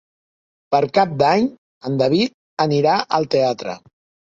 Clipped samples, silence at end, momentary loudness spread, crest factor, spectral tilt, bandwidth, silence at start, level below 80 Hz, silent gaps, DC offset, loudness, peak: under 0.1%; 0.45 s; 11 LU; 18 dB; -6 dB/octave; 7.8 kHz; 0.7 s; -60 dBFS; 1.58-1.81 s, 2.34-2.57 s; under 0.1%; -18 LUFS; -2 dBFS